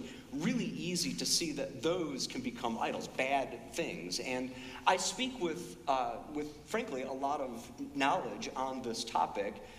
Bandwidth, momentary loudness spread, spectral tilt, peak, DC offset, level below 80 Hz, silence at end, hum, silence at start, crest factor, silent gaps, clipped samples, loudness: 15.5 kHz; 9 LU; -3 dB/octave; -12 dBFS; under 0.1%; -62 dBFS; 0 s; none; 0 s; 24 dB; none; under 0.1%; -36 LUFS